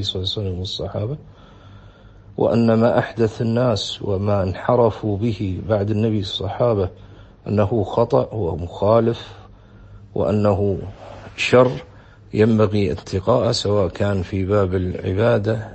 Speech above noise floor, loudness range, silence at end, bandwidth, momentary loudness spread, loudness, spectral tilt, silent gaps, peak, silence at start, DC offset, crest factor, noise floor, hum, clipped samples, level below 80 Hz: 25 dB; 3 LU; 0 s; 8.6 kHz; 11 LU; -20 LUFS; -7 dB/octave; none; -2 dBFS; 0 s; under 0.1%; 18 dB; -44 dBFS; none; under 0.1%; -44 dBFS